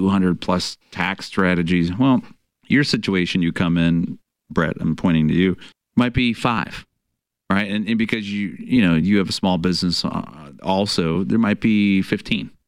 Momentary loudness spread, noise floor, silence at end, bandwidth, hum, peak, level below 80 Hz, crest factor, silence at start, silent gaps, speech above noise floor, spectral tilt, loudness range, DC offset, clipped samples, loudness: 9 LU; -78 dBFS; 0.2 s; 12 kHz; none; -6 dBFS; -44 dBFS; 14 dB; 0 s; none; 59 dB; -6 dB/octave; 2 LU; 0.3%; under 0.1%; -20 LUFS